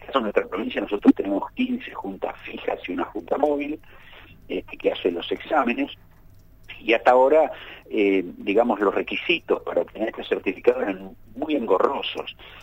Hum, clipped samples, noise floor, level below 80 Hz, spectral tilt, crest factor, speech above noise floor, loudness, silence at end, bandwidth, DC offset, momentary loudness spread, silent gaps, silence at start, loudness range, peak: none; under 0.1%; -49 dBFS; -54 dBFS; -6 dB/octave; 20 dB; 26 dB; -24 LUFS; 0 s; 16 kHz; under 0.1%; 13 LU; none; 0 s; 7 LU; -4 dBFS